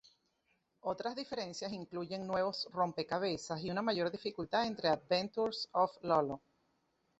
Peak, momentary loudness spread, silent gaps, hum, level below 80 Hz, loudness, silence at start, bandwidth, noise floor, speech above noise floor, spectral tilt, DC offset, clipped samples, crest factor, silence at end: -18 dBFS; 8 LU; none; none; -72 dBFS; -37 LUFS; 0.85 s; 8 kHz; -79 dBFS; 43 dB; -3 dB/octave; under 0.1%; under 0.1%; 20 dB; 0.8 s